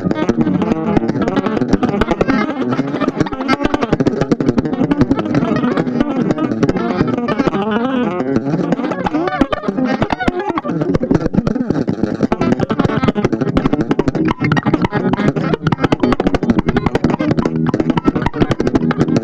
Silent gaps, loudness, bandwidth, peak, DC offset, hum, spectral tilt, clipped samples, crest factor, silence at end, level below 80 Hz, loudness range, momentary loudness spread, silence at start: none; -16 LUFS; 8.4 kHz; 0 dBFS; under 0.1%; none; -7.5 dB/octave; under 0.1%; 16 dB; 0 s; -32 dBFS; 1 LU; 3 LU; 0 s